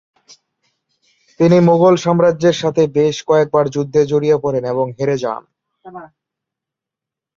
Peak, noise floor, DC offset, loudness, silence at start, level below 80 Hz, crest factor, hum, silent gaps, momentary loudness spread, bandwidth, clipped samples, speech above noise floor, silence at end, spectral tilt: -2 dBFS; -85 dBFS; under 0.1%; -15 LUFS; 1.4 s; -56 dBFS; 14 dB; none; none; 10 LU; 7.6 kHz; under 0.1%; 71 dB; 1.3 s; -7 dB/octave